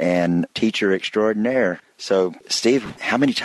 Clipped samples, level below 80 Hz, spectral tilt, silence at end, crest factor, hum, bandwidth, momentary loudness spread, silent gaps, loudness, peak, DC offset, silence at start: under 0.1%; -60 dBFS; -4.5 dB/octave; 0 s; 16 dB; none; 12.5 kHz; 4 LU; none; -20 LUFS; -4 dBFS; under 0.1%; 0 s